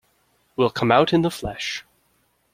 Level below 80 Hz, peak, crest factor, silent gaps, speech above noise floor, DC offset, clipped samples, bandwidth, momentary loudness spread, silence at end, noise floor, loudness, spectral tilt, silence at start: -50 dBFS; -2 dBFS; 22 dB; none; 45 dB; under 0.1%; under 0.1%; 16 kHz; 14 LU; 0.7 s; -66 dBFS; -21 LUFS; -5.5 dB/octave; 0.6 s